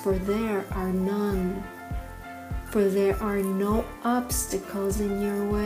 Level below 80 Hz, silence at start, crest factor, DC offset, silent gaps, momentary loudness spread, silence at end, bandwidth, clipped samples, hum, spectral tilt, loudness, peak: -38 dBFS; 0 s; 16 dB; under 0.1%; none; 12 LU; 0 s; 16 kHz; under 0.1%; none; -6 dB/octave; -27 LUFS; -12 dBFS